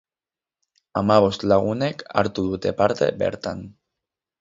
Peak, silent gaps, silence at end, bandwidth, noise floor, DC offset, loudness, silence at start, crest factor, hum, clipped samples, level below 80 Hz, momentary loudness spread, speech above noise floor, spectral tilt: -2 dBFS; none; 0.7 s; 7.8 kHz; under -90 dBFS; under 0.1%; -22 LUFS; 0.95 s; 22 dB; none; under 0.1%; -50 dBFS; 12 LU; over 69 dB; -6.5 dB/octave